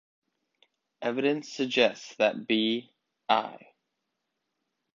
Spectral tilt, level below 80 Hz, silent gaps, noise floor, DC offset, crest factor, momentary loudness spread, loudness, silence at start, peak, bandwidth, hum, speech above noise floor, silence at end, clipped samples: -4 dB/octave; -78 dBFS; none; -82 dBFS; under 0.1%; 22 dB; 10 LU; -28 LUFS; 1 s; -8 dBFS; 7.6 kHz; none; 55 dB; 1.4 s; under 0.1%